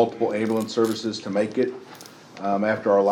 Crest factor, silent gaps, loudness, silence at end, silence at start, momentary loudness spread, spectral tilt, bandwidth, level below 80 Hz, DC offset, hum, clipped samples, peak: 18 dB; none; -24 LUFS; 0 s; 0 s; 19 LU; -5.5 dB/octave; 17 kHz; -74 dBFS; under 0.1%; none; under 0.1%; -6 dBFS